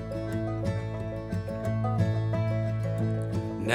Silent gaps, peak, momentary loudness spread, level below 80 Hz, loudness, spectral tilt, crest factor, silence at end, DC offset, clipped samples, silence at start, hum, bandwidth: none; -6 dBFS; 6 LU; -46 dBFS; -30 LUFS; -7.5 dB/octave; 24 dB; 0 s; under 0.1%; under 0.1%; 0 s; none; 10.5 kHz